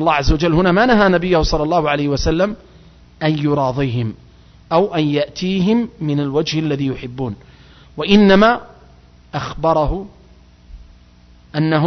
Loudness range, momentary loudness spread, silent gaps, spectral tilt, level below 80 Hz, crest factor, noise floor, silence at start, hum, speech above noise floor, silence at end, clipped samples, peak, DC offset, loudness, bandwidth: 4 LU; 14 LU; none; -6.5 dB/octave; -32 dBFS; 16 dB; -46 dBFS; 0 s; 60 Hz at -40 dBFS; 31 dB; 0 s; under 0.1%; 0 dBFS; under 0.1%; -16 LUFS; 6.4 kHz